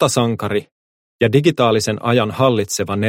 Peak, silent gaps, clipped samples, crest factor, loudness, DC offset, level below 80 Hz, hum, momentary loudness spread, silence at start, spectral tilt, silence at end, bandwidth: -2 dBFS; 0.71-1.19 s; under 0.1%; 16 dB; -17 LUFS; under 0.1%; -54 dBFS; none; 7 LU; 0 s; -5 dB/octave; 0 s; 16.5 kHz